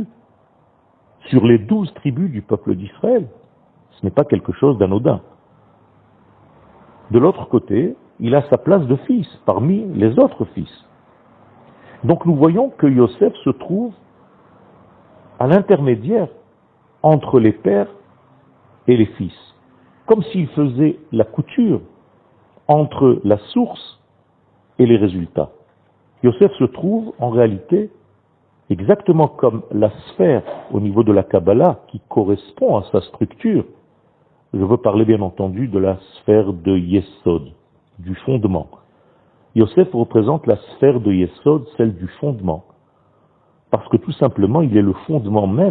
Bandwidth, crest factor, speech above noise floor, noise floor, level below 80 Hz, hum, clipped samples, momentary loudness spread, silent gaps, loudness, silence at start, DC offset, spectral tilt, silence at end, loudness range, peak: 4.5 kHz; 18 dB; 42 dB; -57 dBFS; -50 dBFS; none; under 0.1%; 11 LU; none; -17 LUFS; 0 s; under 0.1%; -12 dB/octave; 0 s; 3 LU; 0 dBFS